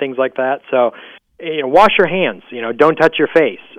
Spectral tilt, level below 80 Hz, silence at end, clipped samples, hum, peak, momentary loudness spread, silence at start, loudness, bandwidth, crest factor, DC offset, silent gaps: -6 dB/octave; -52 dBFS; 0.2 s; under 0.1%; none; 0 dBFS; 12 LU; 0 s; -14 LUFS; 10 kHz; 14 dB; under 0.1%; none